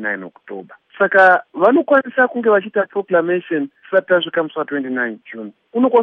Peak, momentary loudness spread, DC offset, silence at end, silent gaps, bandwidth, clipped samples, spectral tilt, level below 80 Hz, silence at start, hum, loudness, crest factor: 0 dBFS; 20 LU; under 0.1%; 0 s; none; 5.6 kHz; under 0.1%; -7 dB/octave; -70 dBFS; 0 s; none; -16 LUFS; 16 dB